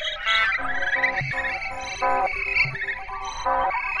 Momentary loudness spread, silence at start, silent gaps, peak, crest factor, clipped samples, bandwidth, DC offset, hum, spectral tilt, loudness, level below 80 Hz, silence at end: 8 LU; 0 s; none; -10 dBFS; 16 dB; under 0.1%; 11.5 kHz; under 0.1%; none; -2.5 dB/octave; -23 LUFS; -44 dBFS; 0 s